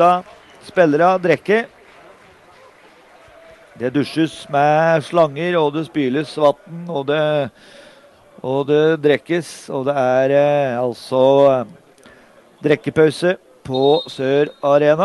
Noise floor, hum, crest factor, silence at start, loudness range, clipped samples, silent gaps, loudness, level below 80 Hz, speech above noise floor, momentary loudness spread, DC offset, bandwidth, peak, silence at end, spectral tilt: -48 dBFS; none; 16 dB; 0 s; 4 LU; under 0.1%; none; -17 LUFS; -62 dBFS; 32 dB; 10 LU; under 0.1%; 12 kHz; -2 dBFS; 0 s; -6.5 dB/octave